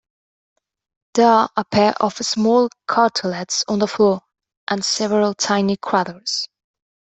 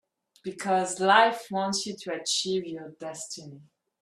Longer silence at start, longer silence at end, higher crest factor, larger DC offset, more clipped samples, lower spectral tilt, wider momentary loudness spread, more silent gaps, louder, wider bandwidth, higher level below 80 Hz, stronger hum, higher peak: first, 1.15 s vs 0.45 s; first, 0.6 s vs 0.4 s; second, 18 dB vs 24 dB; neither; neither; first, -4 dB/octave vs -2.5 dB/octave; second, 8 LU vs 19 LU; first, 4.57-4.67 s vs none; first, -18 LUFS vs -26 LUFS; second, 8.4 kHz vs 13.5 kHz; first, -60 dBFS vs -74 dBFS; neither; about the same, -2 dBFS vs -4 dBFS